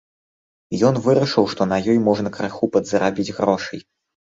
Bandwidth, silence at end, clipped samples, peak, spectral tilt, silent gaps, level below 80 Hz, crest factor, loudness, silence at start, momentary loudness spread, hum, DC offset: 7.8 kHz; 0.4 s; under 0.1%; -2 dBFS; -6 dB/octave; none; -54 dBFS; 18 dB; -19 LUFS; 0.7 s; 8 LU; none; under 0.1%